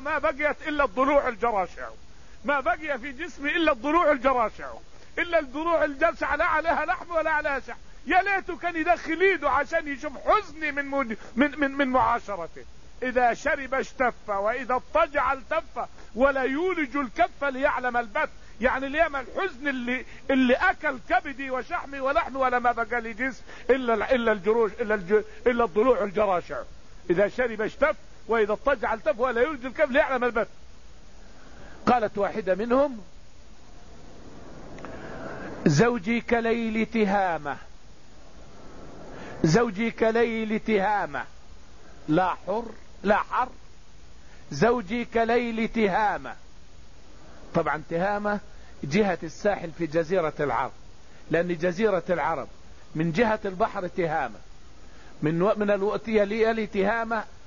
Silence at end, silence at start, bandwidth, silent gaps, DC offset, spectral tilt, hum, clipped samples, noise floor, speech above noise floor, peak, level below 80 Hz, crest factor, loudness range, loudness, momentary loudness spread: 0.05 s; 0 s; 7.4 kHz; none; 0.8%; -6 dB/octave; none; under 0.1%; -51 dBFS; 26 dB; -6 dBFS; -48 dBFS; 20 dB; 3 LU; -25 LUFS; 12 LU